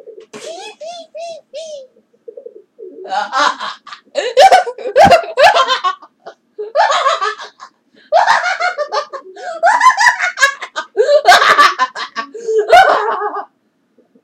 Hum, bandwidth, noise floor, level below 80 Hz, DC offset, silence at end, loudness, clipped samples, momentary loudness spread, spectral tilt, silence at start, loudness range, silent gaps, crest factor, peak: none; 16.5 kHz; -60 dBFS; -52 dBFS; under 0.1%; 0.8 s; -12 LUFS; 0.4%; 21 LU; -1.5 dB/octave; 0.05 s; 11 LU; none; 14 dB; 0 dBFS